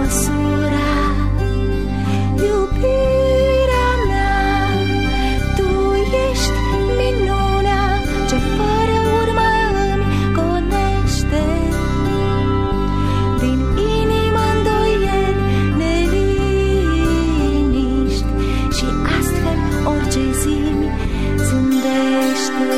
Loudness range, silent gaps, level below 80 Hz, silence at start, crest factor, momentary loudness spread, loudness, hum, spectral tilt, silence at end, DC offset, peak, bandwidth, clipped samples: 2 LU; none; -22 dBFS; 0 s; 12 dB; 3 LU; -17 LUFS; none; -6 dB/octave; 0 s; 2%; -4 dBFS; 15 kHz; under 0.1%